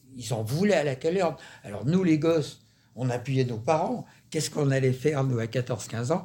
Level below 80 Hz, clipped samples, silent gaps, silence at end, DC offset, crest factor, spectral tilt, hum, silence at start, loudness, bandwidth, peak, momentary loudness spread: -62 dBFS; under 0.1%; none; 0 s; under 0.1%; 16 dB; -6 dB/octave; none; 0.1 s; -27 LUFS; 17 kHz; -10 dBFS; 10 LU